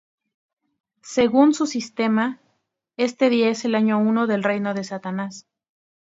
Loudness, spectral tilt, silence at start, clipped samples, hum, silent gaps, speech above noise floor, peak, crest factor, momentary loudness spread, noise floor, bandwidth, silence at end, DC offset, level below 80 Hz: -21 LUFS; -5.5 dB/octave; 1.05 s; under 0.1%; none; none; 51 dB; -2 dBFS; 20 dB; 12 LU; -72 dBFS; 7.8 kHz; 0.75 s; under 0.1%; -66 dBFS